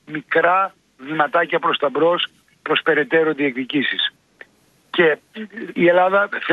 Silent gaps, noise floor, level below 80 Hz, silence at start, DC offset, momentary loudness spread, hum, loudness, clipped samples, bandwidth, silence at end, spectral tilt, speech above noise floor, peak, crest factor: none; -57 dBFS; -70 dBFS; 0.1 s; under 0.1%; 11 LU; none; -18 LUFS; under 0.1%; 6.6 kHz; 0 s; -6.5 dB/octave; 39 dB; -2 dBFS; 18 dB